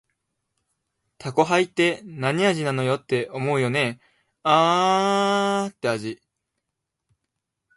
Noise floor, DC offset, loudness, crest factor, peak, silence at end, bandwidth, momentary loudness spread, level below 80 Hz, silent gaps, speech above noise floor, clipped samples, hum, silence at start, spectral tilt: -82 dBFS; under 0.1%; -22 LUFS; 20 dB; -4 dBFS; 1.6 s; 11.5 kHz; 8 LU; -68 dBFS; none; 60 dB; under 0.1%; none; 1.2 s; -5 dB/octave